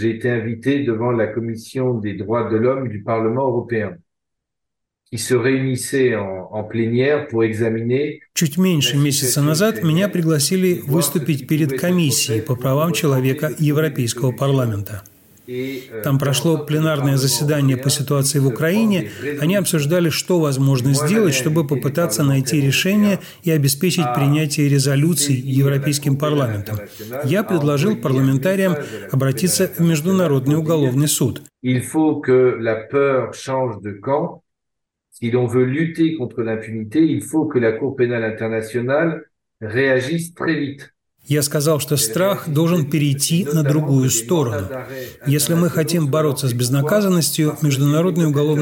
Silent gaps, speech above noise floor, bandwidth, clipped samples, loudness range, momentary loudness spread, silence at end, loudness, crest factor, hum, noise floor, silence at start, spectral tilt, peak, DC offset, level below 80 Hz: none; 63 dB; 17 kHz; under 0.1%; 4 LU; 8 LU; 0 s; -18 LUFS; 14 dB; none; -81 dBFS; 0 s; -5.5 dB/octave; -4 dBFS; under 0.1%; -60 dBFS